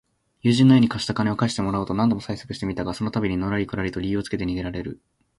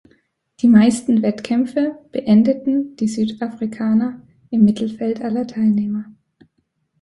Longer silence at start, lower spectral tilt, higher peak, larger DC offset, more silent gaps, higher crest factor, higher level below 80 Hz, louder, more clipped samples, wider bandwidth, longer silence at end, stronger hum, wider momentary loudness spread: second, 0.45 s vs 0.65 s; about the same, -6.5 dB/octave vs -7 dB/octave; about the same, -4 dBFS vs -2 dBFS; neither; neither; about the same, 18 dB vs 16 dB; first, -46 dBFS vs -58 dBFS; second, -23 LUFS vs -18 LUFS; neither; about the same, 11.5 kHz vs 11.5 kHz; second, 0.45 s vs 0.9 s; neither; about the same, 13 LU vs 11 LU